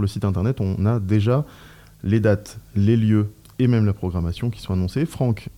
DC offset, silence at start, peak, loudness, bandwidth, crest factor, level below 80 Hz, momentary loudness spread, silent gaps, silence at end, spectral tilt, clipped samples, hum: 0.1%; 0 s; -8 dBFS; -22 LUFS; 13 kHz; 14 dB; -46 dBFS; 7 LU; none; 0.05 s; -8.5 dB/octave; under 0.1%; none